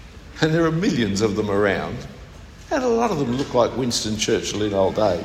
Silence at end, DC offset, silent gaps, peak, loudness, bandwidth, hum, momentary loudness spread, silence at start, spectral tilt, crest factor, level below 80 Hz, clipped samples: 0 s; under 0.1%; none; -4 dBFS; -21 LUFS; 16 kHz; none; 9 LU; 0 s; -5 dB/octave; 18 dB; -44 dBFS; under 0.1%